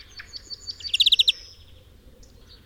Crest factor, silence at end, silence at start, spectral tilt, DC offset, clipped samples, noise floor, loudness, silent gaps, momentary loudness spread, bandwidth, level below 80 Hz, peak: 20 dB; 1.25 s; 0.15 s; 1 dB/octave; under 0.1%; under 0.1%; -50 dBFS; -19 LUFS; none; 23 LU; 16.5 kHz; -52 dBFS; -8 dBFS